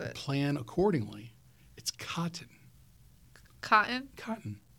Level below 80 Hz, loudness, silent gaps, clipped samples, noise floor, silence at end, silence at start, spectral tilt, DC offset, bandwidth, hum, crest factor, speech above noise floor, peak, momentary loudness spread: -62 dBFS; -32 LUFS; none; under 0.1%; -60 dBFS; 0.2 s; 0 s; -5 dB/octave; under 0.1%; 18.5 kHz; none; 24 dB; 28 dB; -10 dBFS; 18 LU